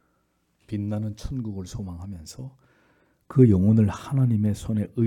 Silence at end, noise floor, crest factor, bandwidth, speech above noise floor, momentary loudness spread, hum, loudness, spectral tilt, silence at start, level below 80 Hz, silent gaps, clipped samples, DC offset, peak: 0 s; -70 dBFS; 20 dB; 12 kHz; 47 dB; 20 LU; none; -24 LUFS; -9 dB/octave; 0.7 s; -50 dBFS; none; under 0.1%; under 0.1%; -4 dBFS